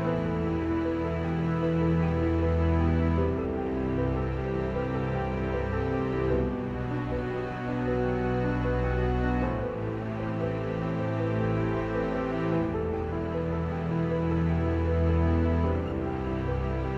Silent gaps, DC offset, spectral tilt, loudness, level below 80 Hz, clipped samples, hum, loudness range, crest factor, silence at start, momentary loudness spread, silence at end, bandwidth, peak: none; under 0.1%; -9.5 dB/octave; -29 LUFS; -38 dBFS; under 0.1%; none; 3 LU; 14 dB; 0 s; 5 LU; 0 s; 7 kHz; -14 dBFS